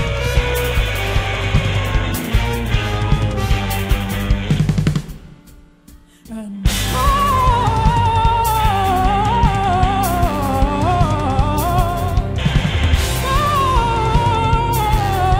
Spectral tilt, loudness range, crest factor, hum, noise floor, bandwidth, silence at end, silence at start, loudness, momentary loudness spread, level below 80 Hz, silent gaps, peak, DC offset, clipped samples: -5.5 dB/octave; 5 LU; 16 dB; none; -44 dBFS; 16.5 kHz; 0 s; 0 s; -17 LUFS; 5 LU; -22 dBFS; none; 0 dBFS; under 0.1%; under 0.1%